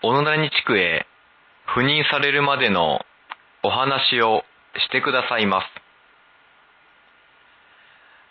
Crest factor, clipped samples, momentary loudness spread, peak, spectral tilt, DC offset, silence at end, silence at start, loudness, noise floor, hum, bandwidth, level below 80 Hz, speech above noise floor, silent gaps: 18 dB; under 0.1%; 16 LU; -6 dBFS; -7 dB/octave; under 0.1%; 2.6 s; 0 s; -19 LUFS; -55 dBFS; none; 6 kHz; -58 dBFS; 35 dB; none